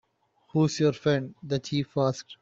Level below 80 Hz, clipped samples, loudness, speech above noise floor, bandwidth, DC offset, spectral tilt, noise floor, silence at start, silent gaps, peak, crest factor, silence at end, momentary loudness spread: -64 dBFS; under 0.1%; -27 LUFS; 40 dB; 7.8 kHz; under 0.1%; -6 dB/octave; -66 dBFS; 0.55 s; none; -12 dBFS; 16 dB; 0.05 s; 8 LU